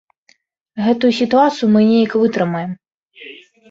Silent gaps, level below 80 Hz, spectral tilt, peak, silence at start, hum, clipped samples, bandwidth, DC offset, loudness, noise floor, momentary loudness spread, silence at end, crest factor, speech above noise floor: 2.94-3.01 s; -60 dBFS; -7 dB/octave; -2 dBFS; 0.75 s; none; under 0.1%; 7.6 kHz; under 0.1%; -15 LUFS; -57 dBFS; 22 LU; 0.35 s; 14 dB; 43 dB